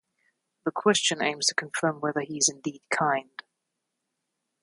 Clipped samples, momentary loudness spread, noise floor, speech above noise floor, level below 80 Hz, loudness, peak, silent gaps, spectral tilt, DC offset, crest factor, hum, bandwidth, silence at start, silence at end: under 0.1%; 12 LU; -82 dBFS; 55 dB; -76 dBFS; -26 LUFS; -6 dBFS; none; -2 dB/octave; under 0.1%; 22 dB; none; 11.5 kHz; 0.65 s; 1.4 s